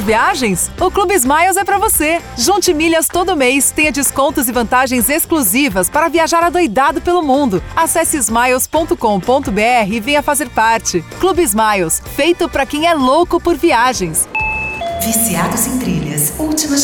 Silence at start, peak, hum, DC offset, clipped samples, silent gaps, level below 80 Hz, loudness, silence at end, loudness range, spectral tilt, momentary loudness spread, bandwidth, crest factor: 0 s; -2 dBFS; none; under 0.1%; under 0.1%; none; -34 dBFS; -13 LUFS; 0 s; 1 LU; -3 dB/octave; 4 LU; 19.5 kHz; 12 dB